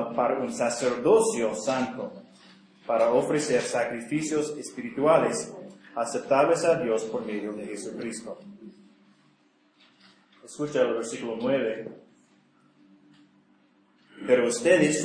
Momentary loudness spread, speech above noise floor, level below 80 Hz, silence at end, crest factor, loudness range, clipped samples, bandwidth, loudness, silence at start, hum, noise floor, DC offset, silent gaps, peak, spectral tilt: 16 LU; 39 dB; -72 dBFS; 0 s; 20 dB; 9 LU; under 0.1%; 10.5 kHz; -26 LUFS; 0 s; none; -64 dBFS; under 0.1%; none; -8 dBFS; -4.5 dB/octave